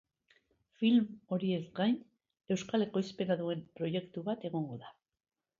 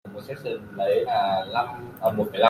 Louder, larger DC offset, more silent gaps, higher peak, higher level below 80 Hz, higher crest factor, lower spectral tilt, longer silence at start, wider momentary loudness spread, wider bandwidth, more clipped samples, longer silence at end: second, -35 LUFS vs -26 LUFS; neither; neither; second, -18 dBFS vs -4 dBFS; second, -76 dBFS vs -64 dBFS; about the same, 18 dB vs 20 dB; about the same, -6.5 dB/octave vs -6 dB/octave; first, 0.8 s vs 0.05 s; about the same, 10 LU vs 11 LU; second, 7.6 kHz vs 16 kHz; neither; first, 0.7 s vs 0 s